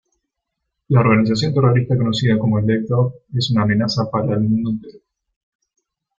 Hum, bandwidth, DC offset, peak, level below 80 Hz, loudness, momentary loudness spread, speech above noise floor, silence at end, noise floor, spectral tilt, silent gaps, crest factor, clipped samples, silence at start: none; 7.6 kHz; under 0.1%; -2 dBFS; -50 dBFS; -17 LUFS; 6 LU; 62 dB; 1.2 s; -78 dBFS; -7 dB/octave; none; 16 dB; under 0.1%; 0.9 s